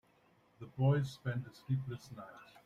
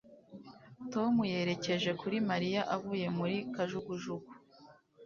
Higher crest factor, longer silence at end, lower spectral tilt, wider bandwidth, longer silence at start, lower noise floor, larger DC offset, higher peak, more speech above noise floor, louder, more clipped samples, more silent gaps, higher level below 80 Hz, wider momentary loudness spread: about the same, 18 dB vs 16 dB; first, 0.2 s vs 0 s; first, -8 dB/octave vs -4.5 dB/octave; first, 9.8 kHz vs 7.2 kHz; first, 0.6 s vs 0.05 s; first, -70 dBFS vs -60 dBFS; neither; about the same, -20 dBFS vs -20 dBFS; first, 33 dB vs 26 dB; about the same, -37 LUFS vs -35 LUFS; neither; neither; about the same, -70 dBFS vs -72 dBFS; about the same, 19 LU vs 21 LU